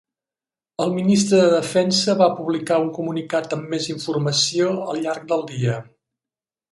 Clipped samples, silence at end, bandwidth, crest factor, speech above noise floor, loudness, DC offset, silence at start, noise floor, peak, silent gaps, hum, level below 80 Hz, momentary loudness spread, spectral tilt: under 0.1%; 0.9 s; 11.5 kHz; 18 dB; over 70 dB; -20 LUFS; under 0.1%; 0.8 s; under -90 dBFS; -4 dBFS; none; none; -64 dBFS; 10 LU; -4.5 dB/octave